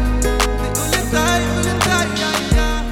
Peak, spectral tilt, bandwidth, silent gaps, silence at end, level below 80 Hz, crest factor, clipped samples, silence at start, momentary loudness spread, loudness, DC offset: -2 dBFS; -4 dB/octave; 18 kHz; none; 0 s; -22 dBFS; 16 dB; under 0.1%; 0 s; 2 LU; -17 LUFS; under 0.1%